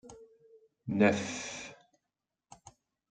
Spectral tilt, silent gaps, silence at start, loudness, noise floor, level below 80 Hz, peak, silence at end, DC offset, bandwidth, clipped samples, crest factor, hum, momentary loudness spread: -5 dB/octave; none; 0.05 s; -31 LUFS; -88 dBFS; -70 dBFS; -12 dBFS; 1.35 s; under 0.1%; 9.2 kHz; under 0.1%; 24 dB; none; 21 LU